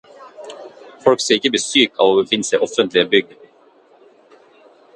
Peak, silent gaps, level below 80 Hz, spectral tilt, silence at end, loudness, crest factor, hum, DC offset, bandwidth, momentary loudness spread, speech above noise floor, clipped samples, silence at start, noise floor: 0 dBFS; none; -62 dBFS; -2.5 dB/octave; 1.75 s; -16 LUFS; 18 dB; none; under 0.1%; 11.5 kHz; 22 LU; 35 dB; under 0.1%; 0.2 s; -51 dBFS